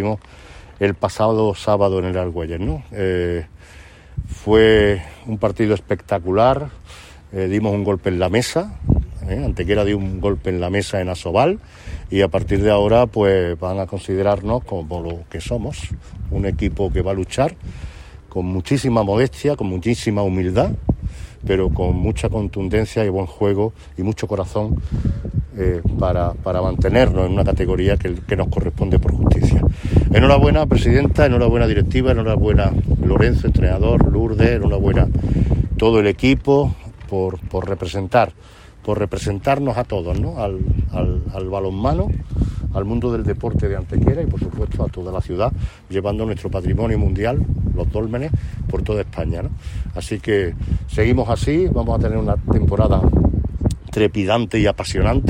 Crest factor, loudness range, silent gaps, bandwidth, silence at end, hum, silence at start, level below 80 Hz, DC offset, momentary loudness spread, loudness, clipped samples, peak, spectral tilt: 16 dB; 6 LU; none; 12 kHz; 0 s; none; 0 s; -26 dBFS; under 0.1%; 10 LU; -19 LUFS; under 0.1%; -2 dBFS; -7.5 dB/octave